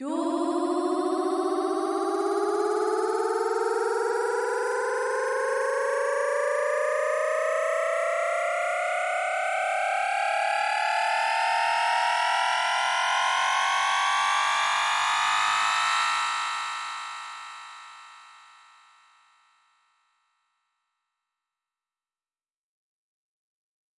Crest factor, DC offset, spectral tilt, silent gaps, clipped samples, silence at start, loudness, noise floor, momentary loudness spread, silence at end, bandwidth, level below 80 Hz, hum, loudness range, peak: 14 dB; under 0.1%; 0 dB/octave; none; under 0.1%; 0 s; -25 LUFS; under -90 dBFS; 4 LU; 5.65 s; 11.5 kHz; -78 dBFS; none; 5 LU; -12 dBFS